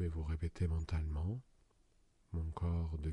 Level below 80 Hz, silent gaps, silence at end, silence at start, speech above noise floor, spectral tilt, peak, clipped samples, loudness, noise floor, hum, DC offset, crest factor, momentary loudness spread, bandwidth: -48 dBFS; none; 0 s; 0 s; 33 dB; -8.5 dB/octave; -26 dBFS; under 0.1%; -41 LUFS; -71 dBFS; none; under 0.1%; 12 dB; 6 LU; 9.2 kHz